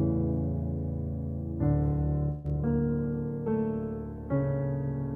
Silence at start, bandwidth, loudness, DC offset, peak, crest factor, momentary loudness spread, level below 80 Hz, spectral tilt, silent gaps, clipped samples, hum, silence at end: 0 s; 2.6 kHz; -31 LUFS; under 0.1%; -14 dBFS; 14 dB; 6 LU; -40 dBFS; -13 dB/octave; none; under 0.1%; none; 0 s